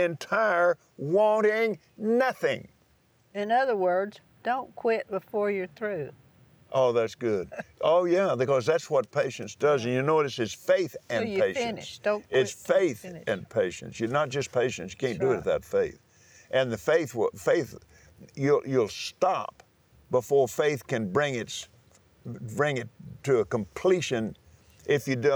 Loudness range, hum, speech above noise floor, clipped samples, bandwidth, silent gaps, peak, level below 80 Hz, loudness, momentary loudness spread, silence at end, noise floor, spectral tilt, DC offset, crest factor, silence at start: 3 LU; none; 38 dB; under 0.1%; over 20 kHz; none; -12 dBFS; -66 dBFS; -27 LUFS; 10 LU; 0 s; -64 dBFS; -5 dB/octave; under 0.1%; 16 dB; 0 s